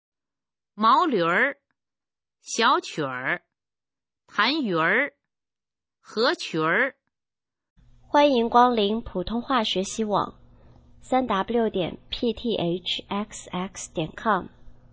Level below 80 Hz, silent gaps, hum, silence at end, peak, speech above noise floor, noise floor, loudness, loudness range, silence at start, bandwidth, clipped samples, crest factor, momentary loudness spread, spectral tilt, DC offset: -54 dBFS; 7.70-7.76 s; none; 0.2 s; -4 dBFS; over 66 dB; under -90 dBFS; -24 LUFS; 4 LU; 0.75 s; 8 kHz; under 0.1%; 20 dB; 12 LU; -4 dB/octave; under 0.1%